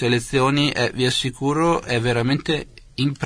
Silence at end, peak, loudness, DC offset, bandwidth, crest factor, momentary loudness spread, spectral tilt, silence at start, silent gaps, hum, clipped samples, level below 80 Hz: 0 s; -6 dBFS; -20 LUFS; under 0.1%; 11 kHz; 14 dB; 6 LU; -5 dB/octave; 0 s; none; none; under 0.1%; -44 dBFS